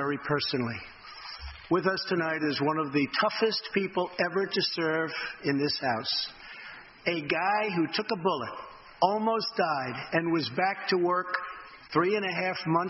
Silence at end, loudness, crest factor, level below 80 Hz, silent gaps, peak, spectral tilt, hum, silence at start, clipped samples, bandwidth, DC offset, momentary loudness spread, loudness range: 0 s; -29 LUFS; 20 dB; -60 dBFS; none; -10 dBFS; -7.5 dB/octave; none; 0 s; under 0.1%; 6 kHz; under 0.1%; 14 LU; 2 LU